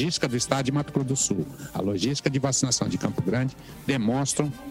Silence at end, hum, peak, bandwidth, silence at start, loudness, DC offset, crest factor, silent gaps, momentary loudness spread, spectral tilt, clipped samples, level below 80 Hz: 0 s; none; -8 dBFS; 16 kHz; 0 s; -26 LUFS; under 0.1%; 18 dB; none; 6 LU; -4.5 dB/octave; under 0.1%; -54 dBFS